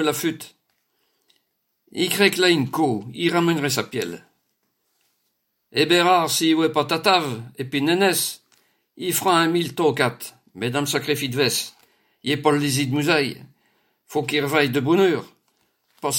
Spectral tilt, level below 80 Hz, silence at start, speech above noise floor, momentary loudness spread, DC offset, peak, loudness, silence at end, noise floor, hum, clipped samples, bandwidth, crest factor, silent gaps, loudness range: -4 dB/octave; -68 dBFS; 0 s; 52 dB; 13 LU; under 0.1%; -4 dBFS; -21 LUFS; 0 s; -73 dBFS; none; under 0.1%; 17 kHz; 20 dB; none; 3 LU